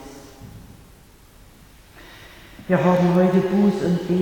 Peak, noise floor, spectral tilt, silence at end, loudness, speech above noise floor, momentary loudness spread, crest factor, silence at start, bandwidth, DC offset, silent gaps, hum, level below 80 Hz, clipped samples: -4 dBFS; -48 dBFS; -8 dB/octave; 0 s; -19 LUFS; 31 dB; 25 LU; 18 dB; 0 s; 17.5 kHz; under 0.1%; none; none; -50 dBFS; under 0.1%